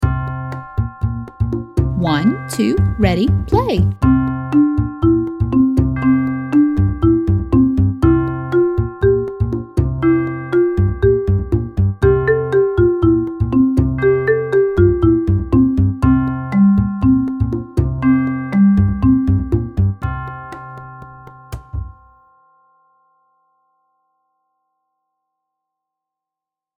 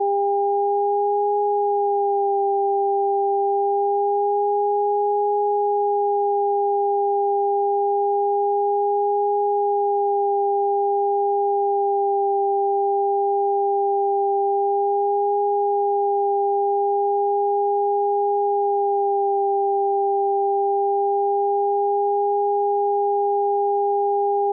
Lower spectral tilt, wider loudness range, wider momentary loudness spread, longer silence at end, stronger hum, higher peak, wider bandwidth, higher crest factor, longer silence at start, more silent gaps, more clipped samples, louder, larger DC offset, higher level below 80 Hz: first, -9 dB/octave vs 16.5 dB/octave; first, 6 LU vs 0 LU; first, 10 LU vs 0 LU; first, 4.9 s vs 0 s; neither; first, 0 dBFS vs -14 dBFS; first, 12 kHz vs 1 kHz; first, 16 dB vs 6 dB; about the same, 0 s vs 0 s; neither; neither; first, -16 LUFS vs -21 LUFS; neither; first, -28 dBFS vs under -90 dBFS